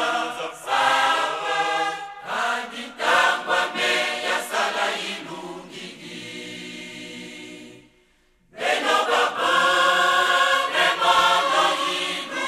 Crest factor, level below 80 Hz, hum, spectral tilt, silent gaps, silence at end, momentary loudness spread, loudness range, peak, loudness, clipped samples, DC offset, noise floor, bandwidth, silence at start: 18 dB; -64 dBFS; none; -1 dB/octave; none; 0 s; 18 LU; 13 LU; -4 dBFS; -21 LUFS; under 0.1%; under 0.1%; -61 dBFS; 14 kHz; 0 s